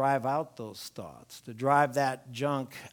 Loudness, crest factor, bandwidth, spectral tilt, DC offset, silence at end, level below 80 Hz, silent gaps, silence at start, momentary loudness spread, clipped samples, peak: -29 LUFS; 20 dB; 19.5 kHz; -5.5 dB/octave; under 0.1%; 0.05 s; -74 dBFS; none; 0 s; 20 LU; under 0.1%; -10 dBFS